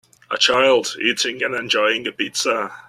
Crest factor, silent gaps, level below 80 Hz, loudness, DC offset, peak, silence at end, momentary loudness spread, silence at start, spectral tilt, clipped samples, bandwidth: 18 dB; none; -64 dBFS; -18 LUFS; under 0.1%; -2 dBFS; 0.05 s; 8 LU; 0.3 s; -1.5 dB/octave; under 0.1%; 14 kHz